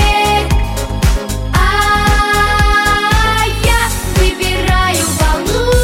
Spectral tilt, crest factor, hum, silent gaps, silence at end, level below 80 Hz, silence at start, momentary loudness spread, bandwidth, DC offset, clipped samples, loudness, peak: -4 dB/octave; 12 dB; none; none; 0 s; -16 dBFS; 0 s; 5 LU; 16.5 kHz; under 0.1%; under 0.1%; -13 LUFS; 0 dBFS